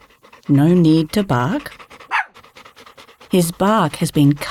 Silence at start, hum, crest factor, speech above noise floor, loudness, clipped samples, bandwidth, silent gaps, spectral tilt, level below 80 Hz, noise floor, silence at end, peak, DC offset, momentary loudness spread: 0.5 s; none; 14 dB; 29 dB; -17 LUFS; under 0.1%; 16 kHz; none; -6.5 dB/octave; -48 dBFS; -44 dBFS; 0 s; -4 dBFS; under 0.1%; 12 LU